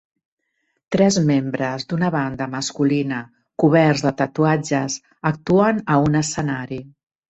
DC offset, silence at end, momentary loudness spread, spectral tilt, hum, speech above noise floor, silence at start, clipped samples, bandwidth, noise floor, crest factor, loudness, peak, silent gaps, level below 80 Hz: under 0.1%; 0.4 s; 10 LU; -5.5 dB/octave; none; 53 dB; 0.9 s; under 0.1%; 8.2 kHz; -72 dBFS; 18 dB; -20 LUFS; -2 dBFS; none; -54 dBFS